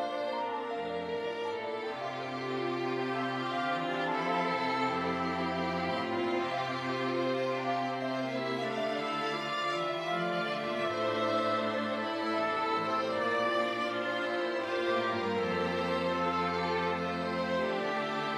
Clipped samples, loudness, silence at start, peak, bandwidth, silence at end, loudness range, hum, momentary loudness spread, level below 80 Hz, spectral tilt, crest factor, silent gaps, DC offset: under 0.1%; -32 LUFS; 0 s; -18 dBFS; 14 kHz; 0 s; 2 LU; none; 5 LU; -74 dBFS; -5.5 dB/octave; 14 dB; none; under 0.1%